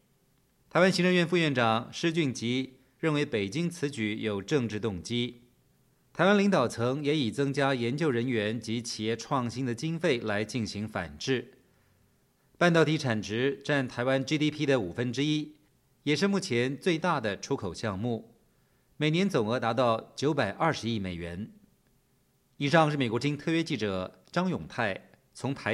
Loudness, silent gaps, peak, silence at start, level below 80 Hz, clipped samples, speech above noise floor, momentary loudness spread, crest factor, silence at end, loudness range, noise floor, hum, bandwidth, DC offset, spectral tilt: -29 LUFS; none; -8 dBFS; 0.75 s; -64 dBFS; under 0.1%; 41 dB; 9 LU; 22 dB; 0 s; 4 LU; -69 dBFS; none; 13 kHz; under 0.1%; -5.5 dB/octave